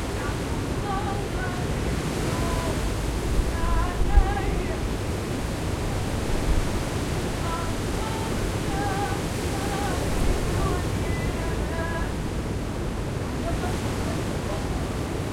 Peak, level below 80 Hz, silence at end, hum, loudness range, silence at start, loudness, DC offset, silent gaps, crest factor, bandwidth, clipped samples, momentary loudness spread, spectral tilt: -6 dBFS; -30 dBFS; 0 s; none; 2 LU; 0 s; -27 LUFS; 0.2%; none; 20 dB; 16.5 kHz; under 0.1%; 3 LU; -5.5 dB/octave